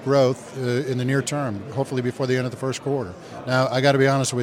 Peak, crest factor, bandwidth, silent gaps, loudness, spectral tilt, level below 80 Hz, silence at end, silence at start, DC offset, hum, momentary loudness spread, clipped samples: -2 dBFS; 20 dB; 15 kHz; none; -23 LUFS; -5.5 dB/octave; -64 dBFS; 0 s; 0 s; under 0.1%; none; 9 LU; under 0.1%